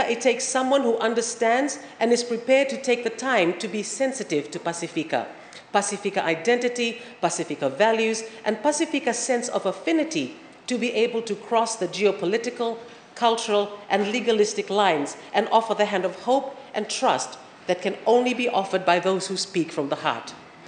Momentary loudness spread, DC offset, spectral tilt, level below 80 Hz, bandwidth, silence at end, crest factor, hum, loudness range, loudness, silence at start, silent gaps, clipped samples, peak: 8 LU; under 0.1%; -3 dB/octave; -80 dBFS; 10 kHz; 0 s; 20 dB; none; 3 LU; -24 LUFS; 0 s; none; under 0.1%; -4 dBFS